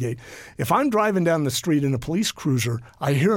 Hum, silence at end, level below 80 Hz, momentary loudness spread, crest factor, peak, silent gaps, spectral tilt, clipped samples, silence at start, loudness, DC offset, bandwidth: none; 0 s; -52 dBFS; 10 LU; 14 dB; -8 dBFS; none; -5.5 dB/octave; under 0.1%; 0 s; -22 LUFS; under 0.1%; 17 kHz